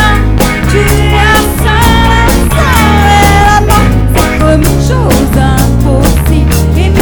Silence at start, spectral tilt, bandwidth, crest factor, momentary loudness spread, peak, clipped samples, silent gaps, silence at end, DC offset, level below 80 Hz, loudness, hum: 0 s; -5.5 dB/octave; over 20 kHz; 6 dB; 4 LU; 0 dBFS; 4%; none; 0 s; 0.6%; -10 dBFS; -7 LUFS; none